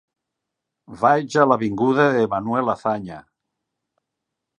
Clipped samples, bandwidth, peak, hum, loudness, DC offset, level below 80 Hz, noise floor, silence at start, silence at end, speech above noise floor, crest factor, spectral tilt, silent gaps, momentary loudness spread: under 0.1%; 10.5 kHz; 0 dBFS; none; -19 LUFS; under 0.1%; -60 dBFS; -82 dBFS; 0.9 s; 1.4 s; 63 dB; 22 dB; -6.5 dB/octave; none; 8 LU